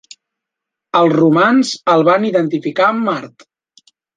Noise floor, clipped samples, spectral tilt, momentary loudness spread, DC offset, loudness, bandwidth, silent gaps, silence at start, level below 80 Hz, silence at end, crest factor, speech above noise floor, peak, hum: -82 dBFS; under 0.1%; -6 dB/octave; 7 LU; under 0.1%; -14 LUFS; 9.4 kHz; none; 0.95 s; -64 dBFS; 0.9 s; 14 dB; 69 dB; 0 dBFS; none